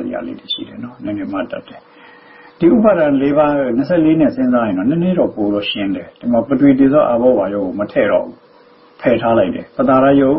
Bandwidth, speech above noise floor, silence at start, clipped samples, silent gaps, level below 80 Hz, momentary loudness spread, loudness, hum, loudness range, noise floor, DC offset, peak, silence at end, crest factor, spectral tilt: 5.6 kHz; 32 dB; 0 s; under 0.1%; none; -48 dBFS; 13 LU; -15 LUFS; none; 2 LU; -46 dBFS; under 0.1%; 0 dBFS; 0 s; 14 dB; -12 dB/octave